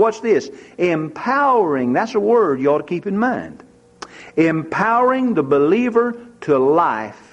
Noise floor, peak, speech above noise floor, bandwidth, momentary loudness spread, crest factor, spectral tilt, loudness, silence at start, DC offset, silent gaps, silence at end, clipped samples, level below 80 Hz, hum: -40 dBFS; -4 dBFS; 23 dB; 8.6 kHz; 11 LU; 14 dB; -7 dB/octave; -17 LUFS; 0 s; under 0.1%; none; 0.15 s; under 0.1%; -60 dBFS; none